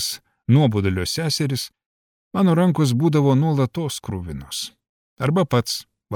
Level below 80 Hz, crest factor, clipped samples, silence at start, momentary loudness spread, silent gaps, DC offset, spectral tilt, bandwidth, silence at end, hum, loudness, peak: -50 dBFS; 16 dB; under 0.1%; 0 s; 12 LU; 1.86-2.31 s, 4.89-5.17 s; under 0.1%; -6 dB/octave; 18 kHz; 0 s; none; -21 LUFS; -6 dBFS